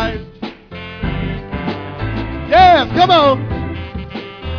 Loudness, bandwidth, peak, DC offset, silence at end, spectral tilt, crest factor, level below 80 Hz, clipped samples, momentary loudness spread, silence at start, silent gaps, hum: -14 LUFS; 5.4 kHz; 0 dBFS; under 0.1%; 0 s; -6.5 dB/octave; 16 dB; -30 dBFS; under 0.1%; 20 LU; 0 s; none; none